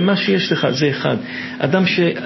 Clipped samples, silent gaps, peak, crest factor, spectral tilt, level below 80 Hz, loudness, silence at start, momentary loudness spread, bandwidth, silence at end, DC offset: under 0.1%; none; -2 dBFS; 16 dB; -6 dB/octave; -58 dBFS; -17 LUFS; 0 s; 7 LU; 6.2 kHz; 0 s; under 0.1%